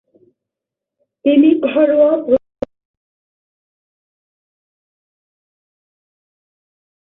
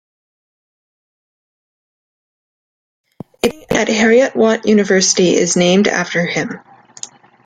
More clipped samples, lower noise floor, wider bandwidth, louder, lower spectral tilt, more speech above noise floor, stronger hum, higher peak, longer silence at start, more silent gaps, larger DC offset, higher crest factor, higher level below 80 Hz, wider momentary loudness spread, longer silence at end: neither; first, -84 dBFS vs -35 dBFS; second, 3.9 kHz vs 15.5 kHz; about the same, -14 LUFS vs -13 LUFS; first, -8 dB/octave vs -3.5 dB/octave; first, 73 dB vs 22 dB; neither; about the same, -2 dBFS vs 0 dBFS; second, 1.25 s vs 3.45 s; neither; neither; about the same, 18 dB vs 16 dB; second, -58 dBFS vs -52 dBFS; about the same, 18 LU vs 20 LU; first, 4.65 s vs 0.4 s